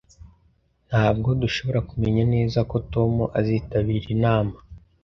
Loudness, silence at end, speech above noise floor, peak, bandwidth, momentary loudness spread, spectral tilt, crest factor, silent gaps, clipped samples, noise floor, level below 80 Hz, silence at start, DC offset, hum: -23 LUFS; 0.25 s; 41 dB; -6 dBFS; 6.6 kHz; 4 LU; -8 dB/octave; 18 dB; none; under 0.1%; -63 dBFS; -40 dBFS; 0.2 s; under 0.1%; none